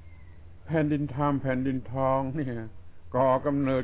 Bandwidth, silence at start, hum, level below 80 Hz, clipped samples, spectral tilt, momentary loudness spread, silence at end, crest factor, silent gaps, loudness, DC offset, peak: 4 kHz; 0 s; none; -50 dBFS; under 0.1%; -12 dB/octave; 9 LU; 0 s; 16 dB; none; -28 LUFS; under 0.1%; -12 dBFS